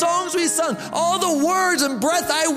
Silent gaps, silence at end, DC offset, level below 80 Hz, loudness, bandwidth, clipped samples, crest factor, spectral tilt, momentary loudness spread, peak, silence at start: none; 0 s; under 0.1%; -60 dBFS; -19 LUFS; 16 kHz; under 0.1%; 14 dB; -2 dB/octave; 4 LU; -6 dBFS; 0 s